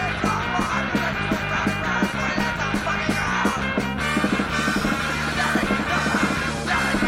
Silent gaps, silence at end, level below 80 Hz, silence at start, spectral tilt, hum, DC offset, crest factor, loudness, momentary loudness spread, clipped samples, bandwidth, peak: none; 0 s; -38 dBFS; 0 s; -4.5 dB/octave; none; under 0.1%; 14 dB; -22 LUFS; 2 LU; under 0.1%; 16.5 kHz; -8 dBFS